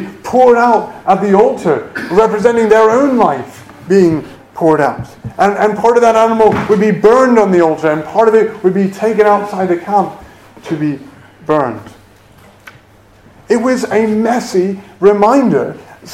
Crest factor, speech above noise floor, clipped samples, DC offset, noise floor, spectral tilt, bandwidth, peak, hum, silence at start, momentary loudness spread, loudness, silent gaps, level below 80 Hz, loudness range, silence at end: 12 dB; 33 dB; 0.4%; under 0.1%; -43 dBFS; -6.5 dB/octave; 14 kHz; 0 dBFS; none; 0 s; 11 LU; -11 LUFS; none; -48 dBFS; 8 LU; 0 s